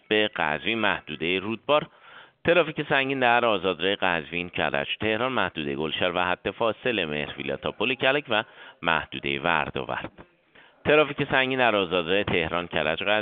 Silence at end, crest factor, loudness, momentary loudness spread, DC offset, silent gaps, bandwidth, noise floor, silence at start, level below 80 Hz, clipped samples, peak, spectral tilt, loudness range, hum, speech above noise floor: 0 s; 22 dB; -25 LUFS; 9 LU; under 0.1%; none; 4.7 kHz; -56 dBFS; 0.1 s; -56 dBFS; under 0.1%; -4 dBFS; -2 dB/octave; 2 LU; none; 31 dB